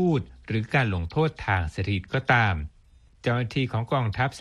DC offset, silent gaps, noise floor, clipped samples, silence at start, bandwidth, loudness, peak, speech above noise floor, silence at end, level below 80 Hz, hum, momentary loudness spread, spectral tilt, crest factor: under 0.1%; none; -55 dBFS; under 0.1%; 0 s; 10.5 kHz; -26 LUFS; -6 dBFS; 31 dB; 0 s; -44 dBFS; none; 9 LU; -7 dB/octave; 20 dB